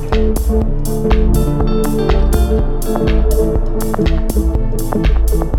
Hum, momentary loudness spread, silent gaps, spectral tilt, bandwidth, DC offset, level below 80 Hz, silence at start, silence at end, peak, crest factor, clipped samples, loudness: none; 4 LU; none; -7 dB/octave; 17 kHz; under 0.1%; -14 dBFS; 0 s; 0 s; -2 dBFS; 12 dB; under 0.1%; -16 LUFS